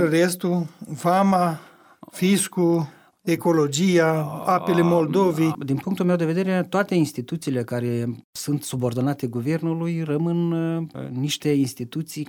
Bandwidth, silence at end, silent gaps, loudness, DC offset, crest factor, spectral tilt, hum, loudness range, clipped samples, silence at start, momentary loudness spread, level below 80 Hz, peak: 18.5 kHz; 0 s; 8.24-8.33 s; -23 LUFS; under 0.1%; 16 dB; -6 dB/octave; none; 4 LU; under 0.1%; 0 s; 10 LU; -64 dBFS; -6 dBFS